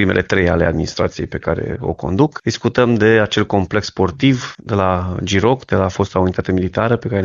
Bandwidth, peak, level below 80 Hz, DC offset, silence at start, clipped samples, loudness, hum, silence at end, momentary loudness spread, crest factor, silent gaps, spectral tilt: 7.6 kHz; 0 dBFS; -38 dBFS; under 0.1%; 0 s; under 0.1%; -17 LUFS; none; 0 s; 7 LU; 16 dB; none; -6 dB/octave